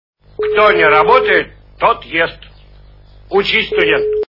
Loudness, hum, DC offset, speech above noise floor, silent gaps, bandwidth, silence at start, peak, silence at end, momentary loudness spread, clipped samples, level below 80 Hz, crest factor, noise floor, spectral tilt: -12 LUFS; 50 Hz at -40 dBFS; under 0.1%; 29 dB; none; 6 kHz; 0.4 s; 0 dBFS; 0.1 s; 9 LU; under 0.1%; -42 dBFS; 14 dB; -41 dBFS; -5.5 dB/octave